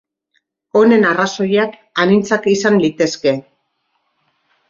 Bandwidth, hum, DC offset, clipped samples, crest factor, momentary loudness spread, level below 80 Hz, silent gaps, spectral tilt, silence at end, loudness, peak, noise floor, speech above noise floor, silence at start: 7.6 kHz; none; under 0.1%; under 0.1%; 14 dB; 7 LU; -60 dBFS; none; -5 dB/octave; 1.3 s; -14 LUFS; -2 dBFS; -67 dBFS; 54 dB; 0.75 s